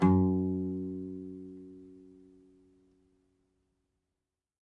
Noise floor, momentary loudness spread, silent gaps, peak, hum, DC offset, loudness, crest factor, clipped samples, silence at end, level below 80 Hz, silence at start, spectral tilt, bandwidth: -88 dBFS; 25 LU; none; -12 dBFS; none; under 0.1%; -32 LUFS; 22 dB; under 0.1%; 2.7 s; -72 dBFS; 0 s; -10.5 dB/octave; 3.8 kHz